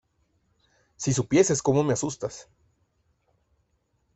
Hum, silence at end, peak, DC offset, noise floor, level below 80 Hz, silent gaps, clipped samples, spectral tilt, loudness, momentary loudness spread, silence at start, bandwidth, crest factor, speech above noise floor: none; 1.75 s; -6 dBFS; under 0.1%; -72 dBFS; -60 dBFS; none; under 0.1%; -5 dB/octave; -25 LUFS; 14 LU; 1 s; 8.4 kHz; 22 dB; 47 dB